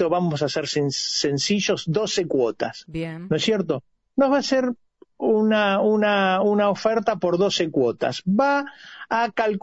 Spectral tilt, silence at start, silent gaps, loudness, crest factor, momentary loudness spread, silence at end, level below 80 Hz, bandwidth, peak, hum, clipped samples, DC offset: -4.5 dB/octave; 0 s; none; -22 LUFS; 14 dB; 10 LU; 0.05 s; -60 dBFS; 8.2 kHz; -8 dBFS; none; under 0.1%; under 0.1%